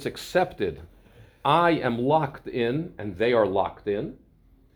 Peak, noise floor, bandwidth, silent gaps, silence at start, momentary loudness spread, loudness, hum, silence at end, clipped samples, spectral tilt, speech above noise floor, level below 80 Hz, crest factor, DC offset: -6 dBFS; -58 dBFS; over 20 kHz; none; 0 s; 10 LU; -25 LUFS; none; 0.6 s; under 0.1%; -6.5 dB/octave; 33 dB; -54 dBFS; 20 dB; under 0.1%